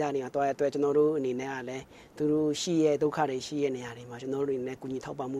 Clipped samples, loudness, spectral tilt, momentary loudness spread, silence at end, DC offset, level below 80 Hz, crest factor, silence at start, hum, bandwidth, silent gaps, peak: under 0.1%; -30 LUFS; -5.5 dB/octave; 12 LU; 0 s; under 0.1%; -66 dBFS; 16 dB; 0 s; none; 12.5 kHz; none; -14 dBFS